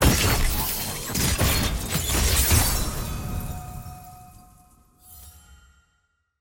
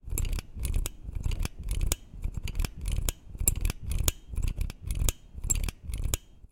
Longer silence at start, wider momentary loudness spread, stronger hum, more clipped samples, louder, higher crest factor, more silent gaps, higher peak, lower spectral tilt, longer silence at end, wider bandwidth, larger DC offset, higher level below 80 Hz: about the same, 0 s vs 0.05 s; first, 23 LU vs 8 LU; neither; neither; first, -23 LUFS vs -33 LUFS; second, 20 dB vs 28 dB; neither; about the same, -4 dBFS vs -4 dBFS; about the same, -3.5 dB/octave vs -3.5 dB/octave; first, 0.85 s vs 0.05 s; about the same, 17 kHz vs 17 kHz; neither; about the same, -30 dBFS vs -32 dBFS